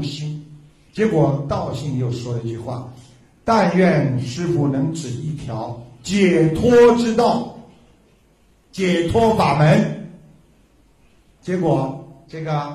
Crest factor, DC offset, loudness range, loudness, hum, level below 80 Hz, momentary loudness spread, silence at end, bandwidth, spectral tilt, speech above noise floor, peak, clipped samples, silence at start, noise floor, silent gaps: 18 dB; under 0.1%; 4 LU; -18 LUFS; none; -46 dBFS; 18 LU; 0 s; 12 kHz; -7 dB/octave; 38 dB; -2 dBFS; under 0.1%; 0 s; -55 dBFS; none